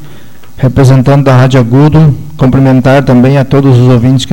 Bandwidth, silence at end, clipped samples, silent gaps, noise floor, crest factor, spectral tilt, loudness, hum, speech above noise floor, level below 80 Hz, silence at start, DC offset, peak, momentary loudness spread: 16 kHz; 0 s; 1%; none; -34 dBFS; 6 dB; -8 dB/octave; -6 LUFS; none; 29 dB; -28 dBFS; 0 s; under 0.1%; 0 dBFS; 4 LU